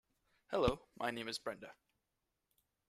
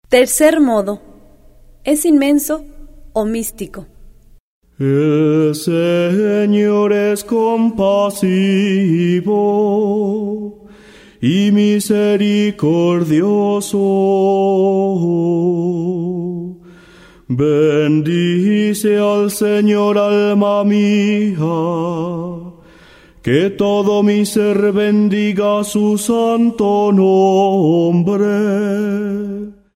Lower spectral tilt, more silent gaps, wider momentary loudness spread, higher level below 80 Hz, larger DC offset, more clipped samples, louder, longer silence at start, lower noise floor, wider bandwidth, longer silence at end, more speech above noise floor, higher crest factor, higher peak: about the same, -5 dB/octave vs -6 dB/octave; second, none vs 4.40-4.61 s; first, 14 LU vs 9 LU; second, -58 dBFS vs -48 dBFS; neither; neither; second, -40 LUFS vs -14 LUFS; first, 0.5 s vs 0.1 s; first, -88 dBFS vs -43 dBFS; about the same, 15 kHz vs 16 kHz; first, 1.15 s vs 0.25 s; first, 48 dB vs 30 dB; first, 26 dB vs 14 dB; second, -18 dBFS vs 0 dBFS